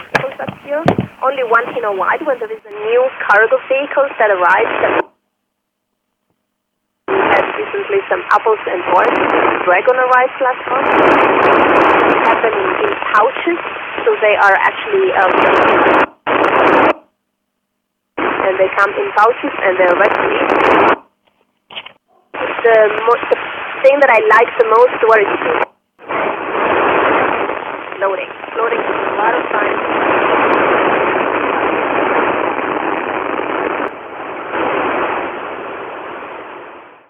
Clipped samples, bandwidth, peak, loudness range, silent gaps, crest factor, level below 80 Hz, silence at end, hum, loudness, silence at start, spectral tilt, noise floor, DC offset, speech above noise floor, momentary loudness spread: under 0.1%; 9.2 kHz; 0 dBFS; 6 LU; none; 14 dB; -52 dBFS; 0.2 s; none; -13 LUFS; 0 s; -6 dB/octave; -72 dBFS; under 0.1%; 60 dB; 13 LU